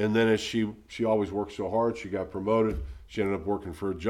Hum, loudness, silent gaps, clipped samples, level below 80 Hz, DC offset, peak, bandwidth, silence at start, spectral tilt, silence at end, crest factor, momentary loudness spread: none; -29 LUFS; none; under 0.1%; -46 dBFS; under 0.1%; -14 dBFS; 13 kHz; 0 s; -6 dB/octave; 0 s; 16 dB; 9 LU